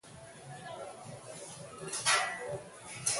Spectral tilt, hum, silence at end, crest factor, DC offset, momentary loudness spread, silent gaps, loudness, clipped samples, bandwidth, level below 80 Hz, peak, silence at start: -1 dB/octave; none; 0 s; 24 dB; under 0.1%; 19 LU; none; -35 LUFS; under 0.1%; 12 kHz; -72 dBFS; -14 dBFS; 0.05 s